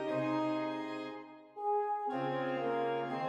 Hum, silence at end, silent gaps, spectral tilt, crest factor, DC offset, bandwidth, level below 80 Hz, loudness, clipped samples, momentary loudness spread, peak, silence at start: none; 0 s; none; -7 dB/octave; 12 dB; under 0.1%; 8.8 kHz; -84 dBFS; -36 LUFS; under 0.1%; 10 LU; -22 dBFS; 0 s